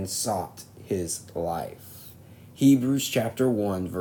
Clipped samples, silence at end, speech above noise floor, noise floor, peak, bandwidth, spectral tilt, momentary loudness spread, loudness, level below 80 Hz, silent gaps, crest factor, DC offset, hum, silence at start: under 0.1%; 0 s; 23 dB; -48 dBFS; -10 dBFS; 19.5 kHz; -5 dB/octave; 22 LU; -26 LUFS; -58 dBFS; none; 18 dB; under 0.1%; none; 0 s